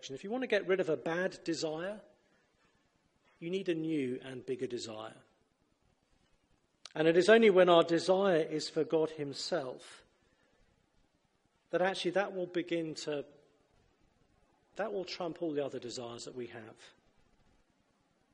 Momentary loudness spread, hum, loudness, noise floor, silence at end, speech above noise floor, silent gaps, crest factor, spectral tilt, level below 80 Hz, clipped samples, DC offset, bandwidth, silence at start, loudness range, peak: 19 LU; none; -32 LUFS; -75 dBFS; 1.45 s; 43 dB; none; 24 dB; -5 dB/octave; -78 dBFS; under 0.1%; under 0.1%; 11 kHz; 0.05 s; 13 LU; -12 dBFS